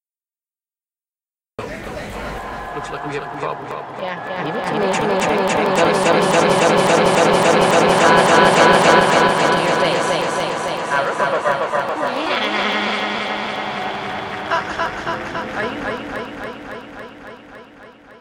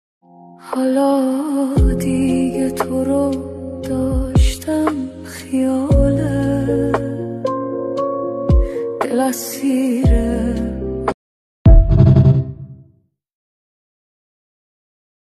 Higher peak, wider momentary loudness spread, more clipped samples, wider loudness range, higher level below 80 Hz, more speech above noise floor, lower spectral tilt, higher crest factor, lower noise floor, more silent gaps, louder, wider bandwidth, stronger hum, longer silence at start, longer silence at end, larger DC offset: about the same, 0 dBFS vs 0 dBFS; first, 17 LU vs 12 LU; neither; first, 15 LU vs 4 LU; second, -48 dBFS vs -22 dBFS; first, over 75 dB vs 39 dB; second, -4 dB/octave vs -7.5 dB/octave; about the same, 18 dB vs 16 dB; first, under -90 dBFS vs -56 dBFS; second, none vs 11.14-11.65 s; about the same, -17 LUFS vs -17 LUFS; first, 17 kHz vs 14 kHz; neither; first, 1.6 s vs 0.5 s; second, 0.1 s vs 2.45 s; neither